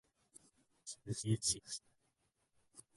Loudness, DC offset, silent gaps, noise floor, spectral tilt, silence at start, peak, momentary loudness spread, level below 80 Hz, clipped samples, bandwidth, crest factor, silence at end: -40 LUFS; under 0.1%; none; -82 dBFS; -3.5 dB/octave; 0.85 s; -22 dBFS; 23 LU; -68 dBFS; under 0.1%; 11.5 kHz; 22 dB; 0.15 s